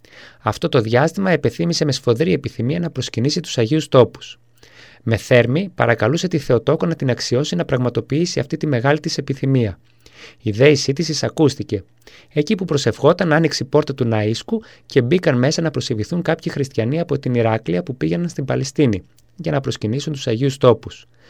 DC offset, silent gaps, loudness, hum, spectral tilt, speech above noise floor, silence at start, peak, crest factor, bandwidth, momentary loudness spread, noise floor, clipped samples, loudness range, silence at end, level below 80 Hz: 0.2%; none; -18 LUFS; none; -6 dB/octave; 28 dB; 0.15 s; 0 dBFS; 18 dB; 13.5 kHz; 8 LU; -46 dBFS; under 0.1%; 3 LU; 0.3 s; -50 dBFS